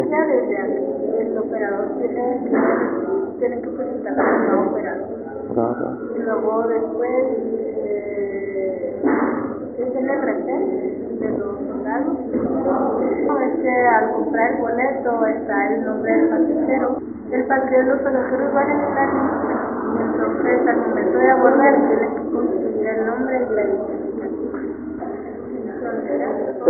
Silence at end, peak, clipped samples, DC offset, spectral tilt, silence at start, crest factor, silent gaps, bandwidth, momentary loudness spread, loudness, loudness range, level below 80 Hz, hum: 0 s; 0 dBFS; under 0.1%; under 0.1%; -1 dB/octave; 0 s; 20 dB; none; 2.4 kHz; 9 LU; -20 LUFS; 5 LU; -56 dBFS; none